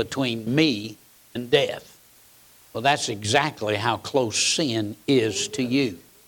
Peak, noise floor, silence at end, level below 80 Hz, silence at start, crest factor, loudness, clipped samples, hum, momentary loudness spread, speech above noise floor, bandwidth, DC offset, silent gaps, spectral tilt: -6 dBFS; -54 dBFS; 0.3 s; -64 dBFS; 0 s; 18 dB; -23 LUFS; under 0.1%; none; 10 LU; 30 dB; 19 kHz; under 0.1%; none; -3.5 dB/octave